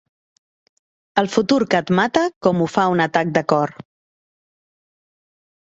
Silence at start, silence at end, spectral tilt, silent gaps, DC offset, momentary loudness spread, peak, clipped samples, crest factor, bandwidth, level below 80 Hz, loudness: 1.15 s; 2.05 s; -6 dB/octave; 2.36-2.41 s; under 0.1%; 4 LU; -2 dBFS; under 0.1%; 20 dB; 8 kHz; -60 dBFS; -18 LUFS